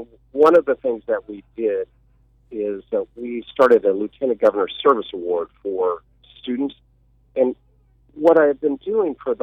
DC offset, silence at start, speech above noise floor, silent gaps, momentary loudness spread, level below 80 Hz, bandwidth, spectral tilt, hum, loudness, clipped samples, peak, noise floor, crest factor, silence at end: under 0.1%; 0 s; 38 dB; none; 15 LU; -58 dBFS; 6.4 kHz; -6.5 dB/octave; none; -20 LUFS; under 0.1%; -4 dBFS; -57 dBFS; 16 dB; 0 s